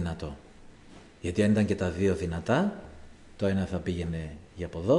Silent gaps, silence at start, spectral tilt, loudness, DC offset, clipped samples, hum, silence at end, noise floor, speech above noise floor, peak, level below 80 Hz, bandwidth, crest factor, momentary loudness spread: none; 0 s; -7 dB/octave; -29 LUFS; under 0.1%; under 0.1%; none; 0 s; -51 dBFS; 23 dB; -12 dBFS; -50 dBFS; 11 kHz; 18 dB; 16 LU